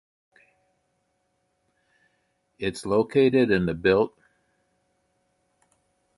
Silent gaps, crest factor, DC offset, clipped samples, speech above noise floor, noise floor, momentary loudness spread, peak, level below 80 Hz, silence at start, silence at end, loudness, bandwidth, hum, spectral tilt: none; 20 dB; under 0.1%; under 0.1%; 51 dB; -73 dBFS; 11 LU; -8 dBFS; -56 dBFS; 2.6 s; 2.1 s; -23 LUFS; 11.5 kHz; none; -6.5 dB/octave